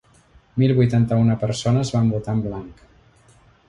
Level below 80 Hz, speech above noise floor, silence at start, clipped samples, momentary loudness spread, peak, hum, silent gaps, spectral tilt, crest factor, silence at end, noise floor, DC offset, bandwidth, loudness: -46 dBFS; 35 dB; 0.55 s; under 0.1%; 11 LU; -6 dBFS; none; none; -7.5 dB/octave; 16 dB; 0.95 s; -54 dBFS; under 0.1%; 10.5 kHz; -20 LUFS